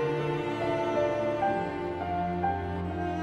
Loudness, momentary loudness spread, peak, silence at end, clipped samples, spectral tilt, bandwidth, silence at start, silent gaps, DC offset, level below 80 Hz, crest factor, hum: -30 LUFS; 5 LU; -16 dBFS; 0 s; under 0.1%; -7.5 dB/octave; 11 kHz; 0 s; none; under 0.1%; -52 dBFS; 14 dB; none